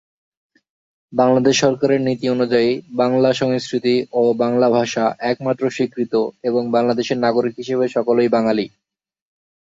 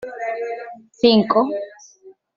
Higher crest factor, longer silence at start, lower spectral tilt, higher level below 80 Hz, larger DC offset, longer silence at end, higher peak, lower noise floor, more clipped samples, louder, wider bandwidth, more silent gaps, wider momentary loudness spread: about the same, 16 dB vs 18 dB; first, 1.1 s vs 0 s; about the same, -5.5 dB/octave vs -6 dB/octave; about the same, -62 dBFS vs -60 dBFS; neither; first, 0.95 s vs 0.25 s; about the same, -2 dBFS vs -2 dBFS; first, -86 dBFS vs -48 dBFS; neither; about the same, -18 LUFS vs -19 LUFS; about the same, 7.8 kHz vs 7.2 kHz; neither; second, 5 LU vs 19 LU